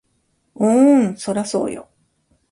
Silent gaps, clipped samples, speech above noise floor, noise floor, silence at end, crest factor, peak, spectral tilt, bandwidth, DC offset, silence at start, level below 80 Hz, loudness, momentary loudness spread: none; under 0.1%; 50 dB; -66 dBFS; 0.7 s; 16 dB; -4 dBFS; -6 dB/octave; 11.5 kHz; under 0.1%; 0.6 s; -60 dBFS; -17 LUFS; 13 LU